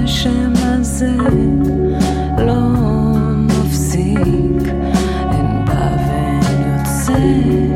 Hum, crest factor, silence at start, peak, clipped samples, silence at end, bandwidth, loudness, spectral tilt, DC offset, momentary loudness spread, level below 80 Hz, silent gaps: none; 12 dB; 0 s; -2 dBFS; under 0.1%; 0 s; 15.5 kHz; -15 LUFS; -6.5 dB/octave; under 0.1%; 3 LU; -22 dBFS; none